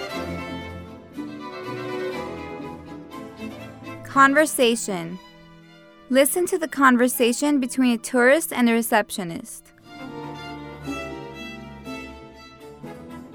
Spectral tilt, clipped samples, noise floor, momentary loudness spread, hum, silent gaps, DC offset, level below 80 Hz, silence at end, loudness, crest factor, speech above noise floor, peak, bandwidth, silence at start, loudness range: -3.5 dB/octave; under 0.1%; -48 dBFS; 22 LU; none; none; under 0.1%; -54 dBFS; 0 s; -21 LUFS; 22 dB; 29 dB; -2 dBFS; over 20 kHz; 0 s; 15 LU